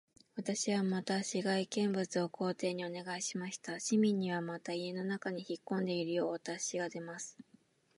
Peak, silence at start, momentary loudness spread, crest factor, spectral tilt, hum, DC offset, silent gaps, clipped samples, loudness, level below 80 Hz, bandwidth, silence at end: -20 dBFS; 0.35 s; 9 LU; 16 dB; -4.5 dB/octave; none; under 0.1%; none; under 0.1%; -37 LUFS; -86 dBFS; 11.5 kHz; 0.55 s